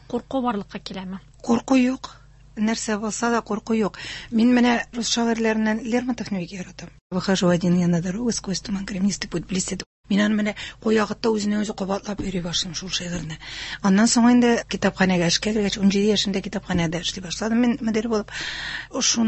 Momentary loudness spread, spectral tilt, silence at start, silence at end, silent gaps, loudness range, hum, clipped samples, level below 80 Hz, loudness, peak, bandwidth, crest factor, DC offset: 12 LU; -4.5 dB/octave; 0.1 s; 0 s; 7.01-7.10 s, 9.86-10.04 s; 5 LU; none; under 0.1%; -48 dBFS; -22 LUFS; -4 dBFS; 8.6 kHz; 18 dB; under 0.1%